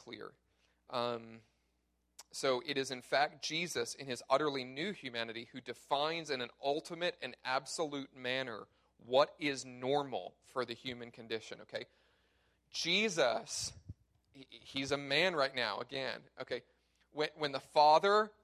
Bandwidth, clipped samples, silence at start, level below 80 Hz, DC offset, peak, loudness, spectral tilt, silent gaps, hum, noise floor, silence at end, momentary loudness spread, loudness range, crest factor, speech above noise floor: 14.5 kHz; under 0.1%; 0.05 s; -74 dBFS; under 0.1%; -14 dBFS; -36 LUFS; -3 dB/octave; none; none; -79 dBFS; 0.15 s; 15 LU; 4 LU; 22 dB; 43 dB